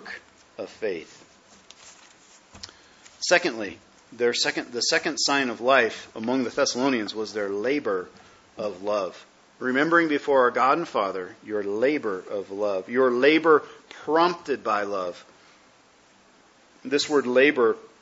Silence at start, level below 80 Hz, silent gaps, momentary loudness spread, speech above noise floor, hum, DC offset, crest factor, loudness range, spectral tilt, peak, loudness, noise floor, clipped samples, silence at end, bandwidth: 0 s; -70 dBFS; none; 16 LU; 33 dB; none; under 0.1%; 22 dB; 6 LU; -3 dB/octave; -4 dBFS; -24 LUFS; -57 dBFS; under 0.1%; 0.15 s; 8 kHz